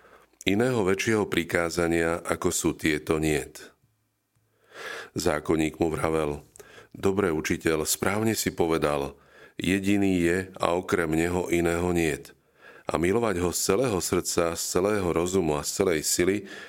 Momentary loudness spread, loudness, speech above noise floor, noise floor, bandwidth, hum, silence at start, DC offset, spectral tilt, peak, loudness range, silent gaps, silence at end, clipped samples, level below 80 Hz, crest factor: 7 LU; -26 LUFS; 47 dB; -72 dBFS; 17 kHz; none; 0.45 s; under 0.1%; -4.5 dB/octave; -4 dBFS; 4 LU; none; 0 s; under 0.1%; -50 dBFS; 22 dB